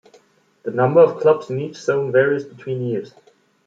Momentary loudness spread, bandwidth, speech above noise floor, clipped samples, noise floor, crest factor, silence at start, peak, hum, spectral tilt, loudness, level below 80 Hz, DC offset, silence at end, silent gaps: 14 LU; 7.8 kHz; 37 dB; under 0.1%; -55 dBFS; 18 dB; 0.65 s; -2 dBFS; none; -7.5 dB/octave; -19 LUFS; -68 dBFS; under 0.1%; 0.6 s; none